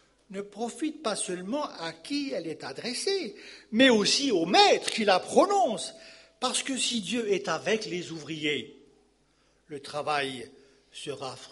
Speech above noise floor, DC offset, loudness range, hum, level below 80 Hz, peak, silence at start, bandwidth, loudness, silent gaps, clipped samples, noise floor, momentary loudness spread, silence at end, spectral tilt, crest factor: 39 dB; under 0.1%; 10 LU; none; -72 dBFS; -6 dBFS; 0.3 s; 11.5 kHz; -27 LUFS; none; under 0.1%; -67 dBFS; 19 LU; 0.05 s; -2.5 dB/octave; 22 dB